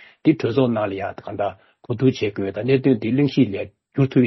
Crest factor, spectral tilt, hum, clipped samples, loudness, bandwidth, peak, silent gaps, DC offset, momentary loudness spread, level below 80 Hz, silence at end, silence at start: 16 dB; -8.5 dB/octave; none; under 0.1%; -21 LUFS; 6 kHz; -4 dBFS; none; under 0.1%; 11 LU; -58 dBFS; 0 s; 0.25 s